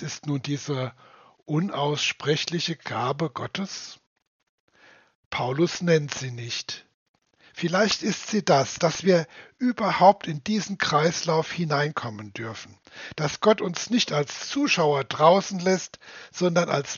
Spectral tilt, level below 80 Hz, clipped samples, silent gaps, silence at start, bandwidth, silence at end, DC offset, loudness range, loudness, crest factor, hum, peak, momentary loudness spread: -4 dB/octave; -66 dBFS; under 0.1%; 4.07-4.16 s, 4.27-4.40 s, 4.49-4.68 s, 5.15-5.31 s, 6.94-7.14 s; 0 s; 7.2 kHz; 0 s; under 0.1%; 6 LU; -24 LUFS; 22 dB; none; -4 dBFS; 15 LU